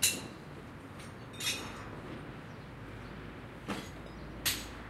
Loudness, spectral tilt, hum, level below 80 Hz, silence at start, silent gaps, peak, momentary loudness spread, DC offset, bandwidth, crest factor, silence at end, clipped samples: -40 LUFS; -2 dB/octave; none; -56 dBFS; 0 s; none; -12 dBFS; 14 LU; under 0.1%; 16 kHz; 28 dB; 0 s; under 0.1%